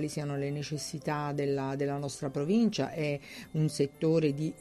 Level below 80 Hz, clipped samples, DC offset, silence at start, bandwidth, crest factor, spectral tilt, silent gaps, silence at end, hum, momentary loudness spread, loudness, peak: -64 dBFS; under 0.1%; under 0.1%; 0 s; 13 kHz; 16 dB; -6 dB/octave; none; 0 s; none; 8 LU; -32 LUFS; -16 dBFS